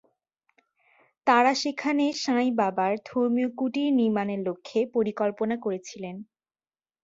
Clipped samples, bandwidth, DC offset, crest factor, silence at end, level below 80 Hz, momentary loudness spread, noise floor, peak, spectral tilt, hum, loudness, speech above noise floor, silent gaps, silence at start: under 0.1%; 7.8 kHz; under 0.1%; 20 dB; 0.8 s; -72 dBFS; 10 LU; under -90 dBFS; -6 dBFS; -5 dB/octave; none; -26 LUFS; over 65 dB; none; 1.25 s